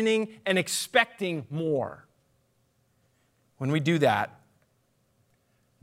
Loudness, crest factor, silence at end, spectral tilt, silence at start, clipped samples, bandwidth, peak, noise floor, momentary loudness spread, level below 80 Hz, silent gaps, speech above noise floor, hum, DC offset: -27 LUFS; 24 dB; 1.55 s; -4.5 dB/octave; 0 s; under 0.1%; 16 kHz; -6 dBFS; -70 dBFS; 9 LU; -76 dBFS; none; 43 dB; none; under 0.1%